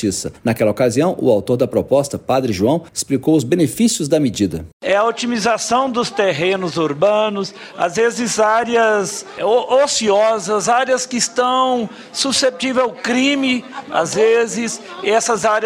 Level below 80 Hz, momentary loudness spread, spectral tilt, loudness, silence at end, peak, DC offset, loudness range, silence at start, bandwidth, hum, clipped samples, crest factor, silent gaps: -52 dBFS; 7 LU; -4 dB/octave; -17 LUFS; 0 s; -2 dBFS; under 0.1%; 2 LU; 0 s; 16 kHz; none; under 0.1%; 14 dB; 4.73-4.80 s